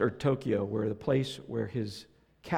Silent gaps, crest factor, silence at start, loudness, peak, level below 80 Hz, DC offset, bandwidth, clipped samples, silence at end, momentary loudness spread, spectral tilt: none; 18 dB; 0 s; -32 LUFS; -14 dBFS; -62 dBFS; under 0.1%; 14.5 kHz; under 0.1%; 0 s; 11 LU; -7 dB/octave